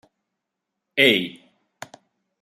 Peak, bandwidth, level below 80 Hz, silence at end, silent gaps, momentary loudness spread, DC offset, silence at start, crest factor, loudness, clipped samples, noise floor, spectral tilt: -2 dBFS; 15.5 kHz; -74 dBFS; 1.1 s; none; 26 LU; under 0.1%; 0.95 s; 24 dB; -19 LUFS; under 0.1%; -82 dBFS; -4 dB/octave